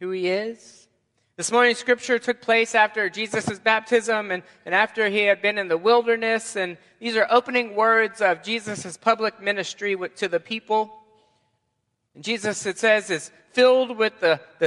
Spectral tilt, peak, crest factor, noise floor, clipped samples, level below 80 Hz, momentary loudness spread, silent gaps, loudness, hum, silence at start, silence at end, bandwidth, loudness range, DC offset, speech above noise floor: -3 dB/octave; -2 dBFS; 20 dB; -75 dBFS; under 0.1%; -72 dBFS; 9 LU; none; -22 LUFS; none; 0 s; 0 s; 11.5 kHz; 5 LU; under 0.1%; 53 dB